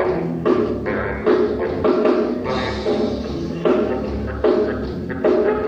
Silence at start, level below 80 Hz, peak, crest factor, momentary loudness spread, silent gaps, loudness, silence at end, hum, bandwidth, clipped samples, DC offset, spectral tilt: 0 s; -36 dBFS; -4 dBFS; 14 dB; 6 LU; none; -20 LUFS; 0 s; none; 7.6 kHz; under 0.1%; under 0.1%; -7.5 dB/octave